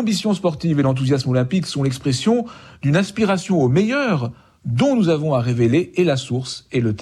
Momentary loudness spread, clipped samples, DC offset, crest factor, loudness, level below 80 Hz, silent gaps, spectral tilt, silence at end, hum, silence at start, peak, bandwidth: 8 LU; under 0.1%; under 0.1%; 12 dB; -19 LUFS; -52 dBFS; none; -6.5 dB/octave; 0 s; none; 0 s; -6 dBFS; 12.5 kHz